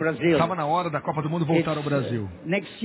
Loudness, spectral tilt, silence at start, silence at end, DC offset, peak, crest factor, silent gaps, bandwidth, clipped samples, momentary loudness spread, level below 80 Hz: -25 LUFS; -11 dB/octave; 0 s; 0 s; under 0.1%; -10 dBFS; 14 dB; none; 4 kHz; under 0.1%; 6 LU; -54 dBFS